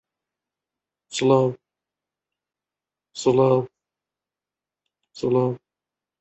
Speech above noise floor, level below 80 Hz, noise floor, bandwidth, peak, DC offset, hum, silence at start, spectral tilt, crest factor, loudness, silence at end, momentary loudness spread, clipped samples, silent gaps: 70 dB; -66 dBFS; -90 dBFS; 8.6 kHz; -6 dBFS; under 0.1%; none; 1.1 s; -6.5 dB/octave; 20 dB; -22 LUFS; 0.65 s; 19 LU; under 0.1%; none